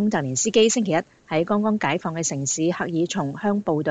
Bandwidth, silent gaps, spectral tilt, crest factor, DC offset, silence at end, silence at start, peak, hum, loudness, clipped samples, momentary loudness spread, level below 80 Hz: 9.4 kHz; none; -4 dB/octave; 16 dB; under 0.1%; 0 s; 0 s; -6 dBFS; none; -22 LUFS; under 0.1%; 7 LU; -62 dBFS